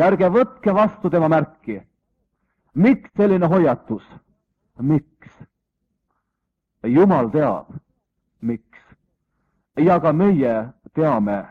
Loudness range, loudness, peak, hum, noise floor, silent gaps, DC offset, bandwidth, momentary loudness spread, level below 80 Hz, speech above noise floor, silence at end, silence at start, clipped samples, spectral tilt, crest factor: 3 LU; -18 LUFS; -4 dBFS; none; -78 dBFS; none; under 0.1%; 5.4 kHz; 14 LU; -56 dBFS; 60 dB; 0.05 s; 0 s; under 0.1%; -10 dB/octave; 16 dB